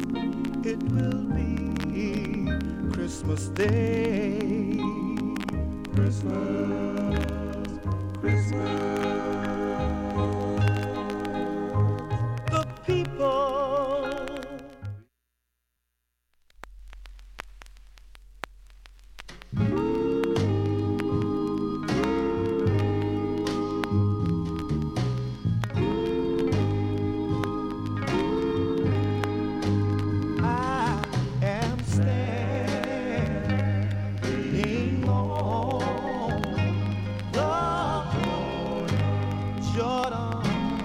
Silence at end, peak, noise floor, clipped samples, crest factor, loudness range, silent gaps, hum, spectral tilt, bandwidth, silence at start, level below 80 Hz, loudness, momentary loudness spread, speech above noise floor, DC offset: 0 s; -8 dBFS; -79 dBFS; under 0.1%; 20 dB; 4 LU; none; none; -7.5 dB/octave; 11.5 kHz; 0 s; -42 dBFS; -27 LUFS; 5 LU; 53 dB; under 0.1%